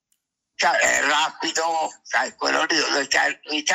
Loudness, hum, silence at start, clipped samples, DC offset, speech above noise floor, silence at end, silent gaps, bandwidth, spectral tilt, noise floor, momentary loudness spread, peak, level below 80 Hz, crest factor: -21 LUFS; none; 0.6 s; under 0.1%; under 0.1%; 52 dB; 0 s; none; 16 kHz; 0 dB/octave; -74 dBFS; 6 LU; -6 dBFS; -66 dBFS; 16 dB